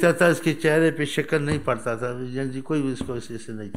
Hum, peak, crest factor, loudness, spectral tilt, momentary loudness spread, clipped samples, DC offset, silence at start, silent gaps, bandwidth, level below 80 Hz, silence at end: none; -6 dBFS; 18 dB; -24 LUFS; -6 dB/octave; 12 LU; under 0.1%; 1%; 0 s; none; 16 kHz; -52 dBFS; 0 s